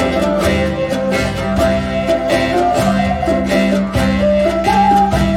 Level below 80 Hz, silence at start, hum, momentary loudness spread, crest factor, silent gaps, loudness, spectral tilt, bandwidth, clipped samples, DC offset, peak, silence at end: -28 dBFS; 0 s; none; 5 LU; 12 dB; none; -14 LUFS; -6 dB/octave; 16 kHz; under 0.1%; under 0.1%; -2 dBFS; 0 s